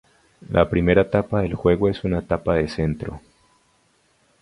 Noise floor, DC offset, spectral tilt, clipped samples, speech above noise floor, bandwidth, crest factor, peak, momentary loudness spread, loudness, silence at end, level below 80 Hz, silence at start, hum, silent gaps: -62 dBFS; under 0.1%; -8.5 dB/octave; under 0.1%; 42 dB; 11 kHz; 22 dB; 0 dBFS; 9 LU; -21 LUFS; 1.25 s; -38 dBFS; 0.5 s; none; none